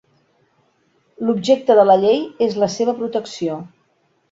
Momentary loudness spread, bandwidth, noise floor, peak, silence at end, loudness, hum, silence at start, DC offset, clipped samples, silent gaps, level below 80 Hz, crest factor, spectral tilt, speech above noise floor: 13 LU; 7.8 kHz; -63 dBFS; -2 dBFS; 0.65 s; -17 LUFS; none; 1.2 s; under 0.1%; under 0.1%; none; -64 dBFS; 18 dB; -5.5 dB/octave; 47 dB